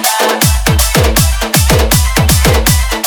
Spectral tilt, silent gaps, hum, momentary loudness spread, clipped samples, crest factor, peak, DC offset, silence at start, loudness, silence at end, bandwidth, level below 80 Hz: -3.5 dB/octave; none; none; 2 LU; 0.2%; 10 dB; 0 dBFS; under 0.1%; 0 s; -10 LUFS; 0 s; over 20 kHz; -14 dBFS